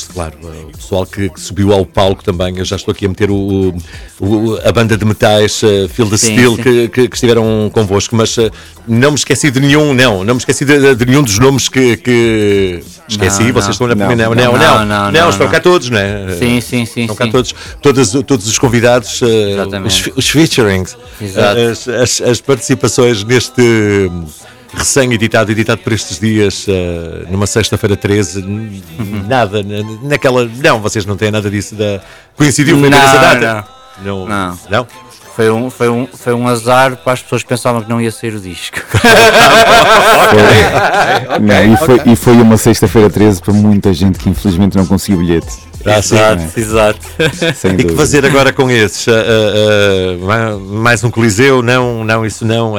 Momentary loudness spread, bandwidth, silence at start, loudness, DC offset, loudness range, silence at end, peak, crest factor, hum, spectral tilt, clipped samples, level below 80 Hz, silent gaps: 11 LU; over 20 kHz; 0 s; -10 LUFS; 0.4%; 7 LU; 0 s; 0 dBFS; 10 dB; none; -4.5 dB/octave; under 0.1%; -34 dBFS; none